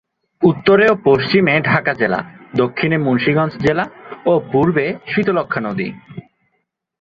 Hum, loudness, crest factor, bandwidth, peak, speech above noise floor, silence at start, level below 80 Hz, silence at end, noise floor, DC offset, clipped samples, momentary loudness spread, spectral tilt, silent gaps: none; -16 LUFS; 16 dB; 7 kHz; 0 dBFS; 55 dB; 0.4 s; -50 dBFS; 0.8 s; -70 dBFS; under 0.1%; under 0.1%; 11 LU; -8 dB/octave; none